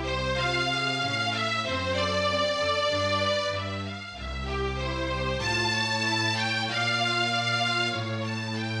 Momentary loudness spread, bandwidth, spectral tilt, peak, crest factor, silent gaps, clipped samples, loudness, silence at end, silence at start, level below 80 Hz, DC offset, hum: 6 LU; 12 kHz; -4 dB/octave; -14 dBFS; 14 dB; none; under 0.1%; -27 LUFS; 0 s; 0 s; -44 dBFS; under 0.1%; none